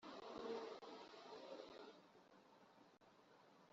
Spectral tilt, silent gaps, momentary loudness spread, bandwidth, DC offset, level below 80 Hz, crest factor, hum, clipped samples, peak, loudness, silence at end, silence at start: -2 dB/octave; none; 18 LU; 7.6 kHz; under 0.1%; -90 dBFS; 20 dB; none; under 0.1%; -38 dBFS; -55 LUFS; 0.05 s; 0 s